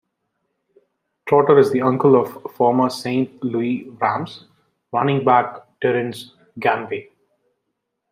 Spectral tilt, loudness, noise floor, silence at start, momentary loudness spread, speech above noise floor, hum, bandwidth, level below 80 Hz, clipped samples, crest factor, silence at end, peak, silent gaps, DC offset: -7 dB/octave; -19 LUFS; -76 dBFS; 1.25 s; 16 LU; 58 dB; none; 15.5 kHz; -66 dBFS; under 0.1%; 18 dB; 1.1 s; -2 dBFS; none; under 0.1%